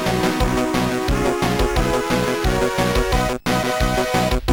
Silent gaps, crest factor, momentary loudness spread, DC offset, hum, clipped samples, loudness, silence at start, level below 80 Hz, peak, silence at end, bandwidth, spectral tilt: none; 14 dB; 1 LU; under 0.1%; none; under 0.1%; -19 LUFS; 0 s; -26 dBFS; -6 dBFS; 0 s; 19 kHz; -5 dB/octave